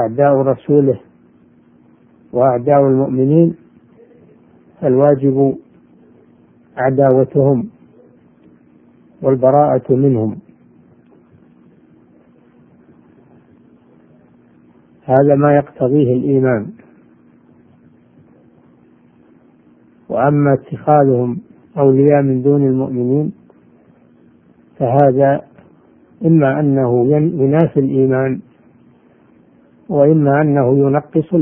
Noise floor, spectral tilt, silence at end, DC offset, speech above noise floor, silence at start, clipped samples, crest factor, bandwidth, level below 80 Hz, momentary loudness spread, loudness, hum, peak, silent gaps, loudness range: -49 dBFS; -13.5 dB/octave; 0 s; under 0.1%; 36 dB; 0 s; under 0.1%; 16 dB; 3.3 kHz; -54 dBFS; 10 LU; -14 LUFS; none; 0 dBFS; none; 5 LU